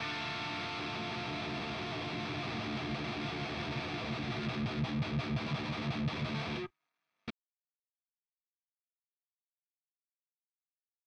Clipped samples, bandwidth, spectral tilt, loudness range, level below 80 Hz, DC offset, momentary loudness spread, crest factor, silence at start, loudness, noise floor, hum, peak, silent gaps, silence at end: under 0.1%; 9.6 kHz; -6 dB/octave; 13 LU; -58 dBFS; under 0.1%; 3 LU; 16 dB; 0 s; -37 LUFS; under -90 dBFS; none; -22 dBFS; none; 3.75 s